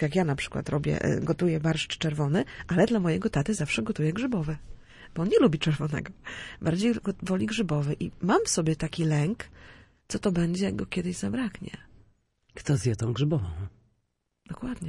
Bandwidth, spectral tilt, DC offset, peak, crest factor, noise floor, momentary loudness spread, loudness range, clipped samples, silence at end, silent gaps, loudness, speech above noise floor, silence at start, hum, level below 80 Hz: 11.5 kHz; -6 dB/octave; under 0.1%; -8 dBFS; 20 dB; -77 dBFS; 14 LU; 5 LU; under 0.1%; 0 s; none; -28 LUFS; 50 dB; 0 s; none; -50 dBFS